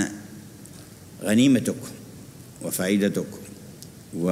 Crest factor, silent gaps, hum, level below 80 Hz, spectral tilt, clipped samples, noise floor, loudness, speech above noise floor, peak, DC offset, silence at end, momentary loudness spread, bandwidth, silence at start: 18 dB; none; none; -60 dBFS; -5 dB/octave; under 0.1%; -44 dBFS; -24 LUFS; 22 dB; -8 dBFS; under 0.1%; 0 s; 23 LU; 16 kHz; 0 s